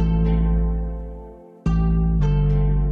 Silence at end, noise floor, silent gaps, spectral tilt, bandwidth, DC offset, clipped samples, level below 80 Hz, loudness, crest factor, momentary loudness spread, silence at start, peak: 0 s; -40 dBFS; none; -10 dB/octave; 4.6 kHz; under 0.1%; under 0.1%; -22 dBFS; -21 LUFS; 10 dB; 15 LU; 0 s; -10 dBFS